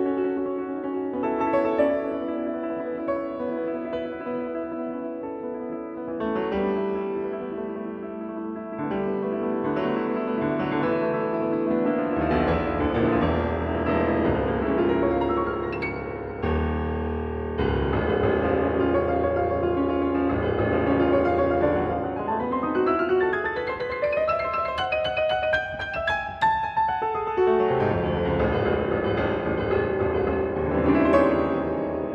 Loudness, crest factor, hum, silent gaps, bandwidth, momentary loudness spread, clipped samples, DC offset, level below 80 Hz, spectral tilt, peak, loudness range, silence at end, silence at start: -25 LUFS; 18 dB; none; none; 6.8 kHz; 9 LU; under 0.1%; under 0.1%; -40 dBFS; -8.5 dB/octave; -8 dBFS; 6 LU; 0 s; 0 s